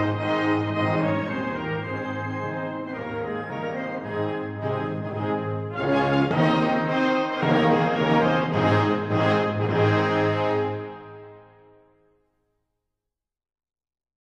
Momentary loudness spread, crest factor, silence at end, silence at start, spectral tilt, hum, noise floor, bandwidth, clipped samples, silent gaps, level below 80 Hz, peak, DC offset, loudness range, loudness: 9 LU; 18 dB; 2.9 s; 0 s; -7.5 dB/octave; none; -86 dBFS; 8.2 kHz; under 0.1%; none; -58 dBFS; -8 dBFS; under 0.1%; 8 LU; -24 LUFS